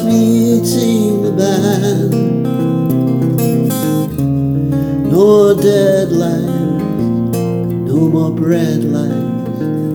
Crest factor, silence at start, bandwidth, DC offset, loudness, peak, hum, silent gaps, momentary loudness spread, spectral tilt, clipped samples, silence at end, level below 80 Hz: 12 dB; 0 s; over 20 kHz; under 0.1%; -13 LUFS; 0 dBFS; none; none; 6 LU; -7 dB/octave; under 0.1%; 0 s; -42 dBFS